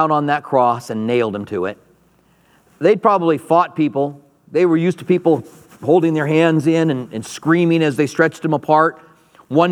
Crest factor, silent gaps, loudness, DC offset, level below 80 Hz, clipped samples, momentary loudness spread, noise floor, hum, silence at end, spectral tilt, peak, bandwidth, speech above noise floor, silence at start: 16 dB; none; -17 LUFS; under 0.1%; -66 dBFS; under 0.1%; 9 LU; -55 dBFS; none; 0 s; -7 dB/octave; 0 dBFS; 13 kHz; 39 dB; 0 s